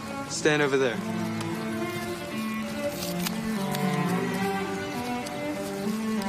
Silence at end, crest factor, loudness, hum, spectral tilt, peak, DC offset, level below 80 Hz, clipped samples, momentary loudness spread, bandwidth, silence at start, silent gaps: 0 s; 18 dB; -29 LUFS; none; -5 dB/octave; -10 dBFS; under 0.1%; -60 dBFS; under 0.1%; 8 LU; 15.5 kHz; 0 s; none